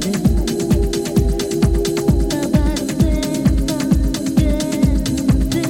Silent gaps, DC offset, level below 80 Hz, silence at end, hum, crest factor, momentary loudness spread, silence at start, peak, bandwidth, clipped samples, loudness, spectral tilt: none; under 0.1%; -22 dBFS; 0 s; none; 14 dB; 1 LU; 0 s; -2 dBFS; 17 kHz; under 0.1%; -17 LUFS; -6 dB/octave